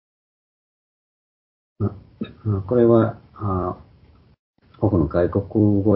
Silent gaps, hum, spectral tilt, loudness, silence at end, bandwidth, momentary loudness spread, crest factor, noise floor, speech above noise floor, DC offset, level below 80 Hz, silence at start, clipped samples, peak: 4.39-4.54 s; none; -14 dB/octave; -21 LUFS; 0 s; 4.5 kHz; 14 LU; 20 dB; -52 dBFS; 33 dB; under 0.1%; -40 dBFS; 1.8 s; under 0.1%; -2 dBFS